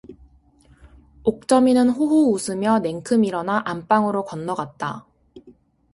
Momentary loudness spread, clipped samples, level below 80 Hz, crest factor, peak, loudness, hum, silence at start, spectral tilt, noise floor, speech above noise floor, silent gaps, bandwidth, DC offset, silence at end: 11 LU; under 0.1%; -56 dBFS; 18 dB; -4 dBFS; -20 LUFS; none; 0.1 s; -5.5 dB/octave; -54 dBFS; 34 dB; none; 11.5 kHz; under 0.1%; 0.45 s